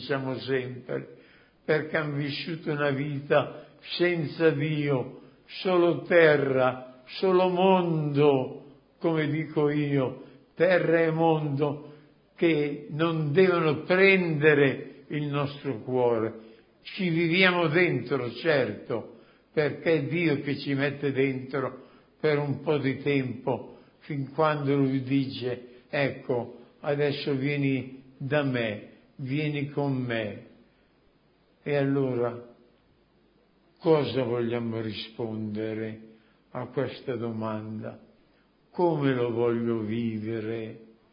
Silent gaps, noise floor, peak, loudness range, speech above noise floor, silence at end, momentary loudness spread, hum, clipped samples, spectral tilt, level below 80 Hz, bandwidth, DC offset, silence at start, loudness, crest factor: none; -64 dBFS; -6 dBFS; 8 LU; 38 dB; 0.3 s; 14 LU; none; under 0.1%; -11 dB/octave; -68 dBFS; 5.4 kHz; under 0.1%; 0 s; -27 LUFS; 20 dB